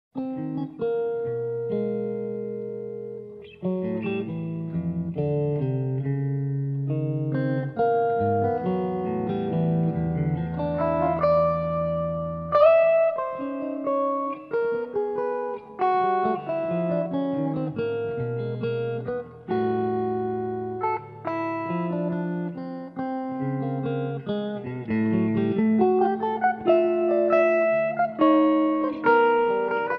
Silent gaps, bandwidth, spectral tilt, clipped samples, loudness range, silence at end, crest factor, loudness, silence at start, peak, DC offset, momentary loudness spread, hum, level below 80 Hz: none; 5.6 kHz; -10.5 dB/octave; under 0.1%; 8 LU; 0 s; 18 dB; -25 LUFS; 0.15 s; -6 dBFS; under 0.1%; 10 LU; none; -56 dBFS